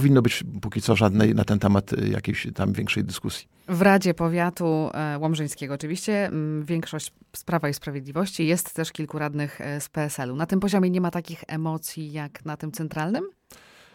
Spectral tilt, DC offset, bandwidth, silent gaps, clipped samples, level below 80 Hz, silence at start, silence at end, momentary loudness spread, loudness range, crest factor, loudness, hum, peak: -6 dB/octave; under 0.1%; 17 kHz; none; under 0.1%; -54 dBFS; 0 s; 0.4 s; 13 LU; 5 LU; 20 dB; -25 LUFS; none; -6 dBFS